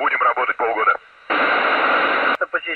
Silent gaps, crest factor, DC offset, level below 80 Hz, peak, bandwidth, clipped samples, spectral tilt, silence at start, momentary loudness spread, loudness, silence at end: none; 14 dB; under 0.1%; -62 dBFS; -6 dBFS; 6 kHz; under 0.1%; -4.5 dB/octave; 0 s; 5 LU; -18 LUFS; 0 s